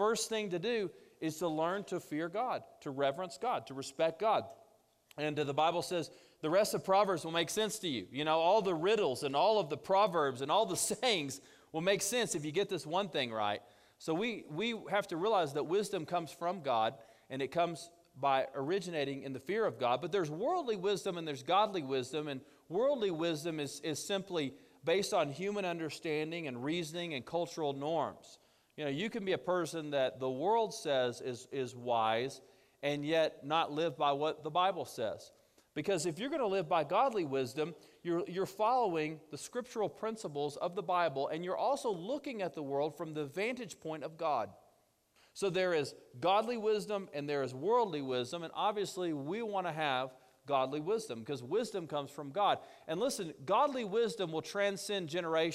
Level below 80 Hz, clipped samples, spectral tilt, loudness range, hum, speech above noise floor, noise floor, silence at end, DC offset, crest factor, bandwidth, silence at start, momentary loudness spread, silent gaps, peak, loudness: -78 dBFS; under 0.1%; -4 dB/octave; 5 LU; none; 37 dB; -72 dBFS; 0 s; under 0.1%; 18 dB; 15 kHz; 0 s; 9 LU; none; -18 dBFS; -35 LUFS